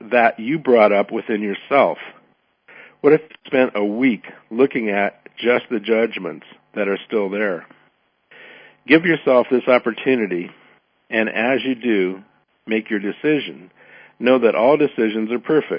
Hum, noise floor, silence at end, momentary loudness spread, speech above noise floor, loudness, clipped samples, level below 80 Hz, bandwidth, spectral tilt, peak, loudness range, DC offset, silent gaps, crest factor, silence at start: none; -61 dBFS; 0 s; 12 LU; 43 dB; -18 LUFS; under 0.1%; -72 dBFS; 5.2 kHz; -10.5 dB/octave; 0 dBFS; 4 LU; under 0.1%; none; 20 dB; 0.05 s